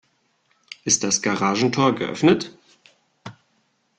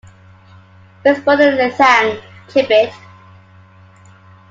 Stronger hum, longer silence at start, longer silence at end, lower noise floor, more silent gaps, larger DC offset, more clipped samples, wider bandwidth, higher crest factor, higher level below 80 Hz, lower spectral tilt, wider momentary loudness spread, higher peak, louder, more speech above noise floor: neither; second, 0.85 s vs 1.05 s; second, 0.65 s vs 1.55 s; first, -67 dBFS vs -44 dBFS; neither; neither; neither; first, 10.5 kHz vs 7.6 kHz; about the same, 20 dB vs 16 dB; about the same, -60 dBFS vs -60 dBFS; about the same, -3.5 dB/octave vs -4.5 dB/octave; first, 24 LU vs 9 LU; second, -4 dBFS vs 0 dBFS; second, -20 LUFS vs -13 LUFS; first, 47 dB vs 31 dB